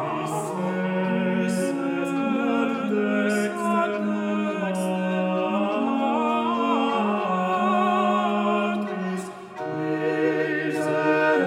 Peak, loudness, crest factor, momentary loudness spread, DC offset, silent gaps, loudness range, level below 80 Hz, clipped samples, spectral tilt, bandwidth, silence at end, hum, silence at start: -8 dBFS; -24 LUFS; 14 dB; 6 LU; under 0.1%; none; 2 LU; -76 dBFS; under 0.1%; -6 dB/octave; 15.5 kHz; 0 s; none; 0 s